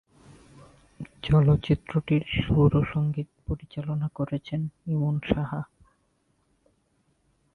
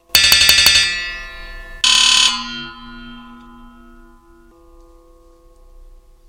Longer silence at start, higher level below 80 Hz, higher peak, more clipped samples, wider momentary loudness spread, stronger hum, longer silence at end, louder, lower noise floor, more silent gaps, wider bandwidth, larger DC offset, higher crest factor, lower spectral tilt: first, 1 s vs 0.15 s; about the same, -44 dBFS vs -40 dBFS; second, -8 dBFS vs 0 dBFS; neither; second, 14 LU vs 26 LU; neither; second, 1.9 s vs 2.95 s; second, -26 LUFS vs -10 LUFS; first, -70 dBFS vs -47 dBFS; neither; second, 4.5 kHz vs 16.5 kHz; neither; about the same, 20 dB vs 18 dB; first, -9 dB/octave vs 1 dB/octave